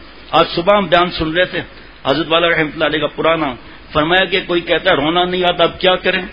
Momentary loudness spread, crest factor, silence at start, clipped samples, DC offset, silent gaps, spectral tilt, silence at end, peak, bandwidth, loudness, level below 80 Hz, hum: 6 LU; 16 dB; 0 s; under 0.1%; 0.7%; none; -7 dB/octave; 0 s; 0 dBFS; 6.8 kHz; -15 LUFS; -40 dBFS; none